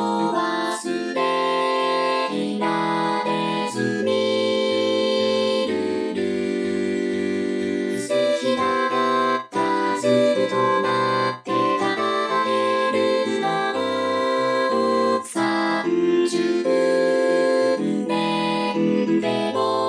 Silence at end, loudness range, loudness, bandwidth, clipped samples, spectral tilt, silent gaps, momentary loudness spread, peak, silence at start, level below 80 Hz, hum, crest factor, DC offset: 0 s; 2 LU; -21 LUFS; 11 kHz; under 0.1%; -4.5 dB/octave; none; 4 LU; -6 dBFS; 0 s; -70 dBFS; none; 16 dB; under 0.1%